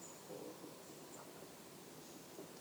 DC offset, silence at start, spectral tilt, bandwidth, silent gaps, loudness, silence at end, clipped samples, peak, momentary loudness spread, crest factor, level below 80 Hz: under 0.1%; 0 s; -3.5 dB/octave; over 20 kHz; none; -54 LUFS; 0 s; under 0.1%; -40 dBFS; 3 LU; 14 dB; -86 dBFS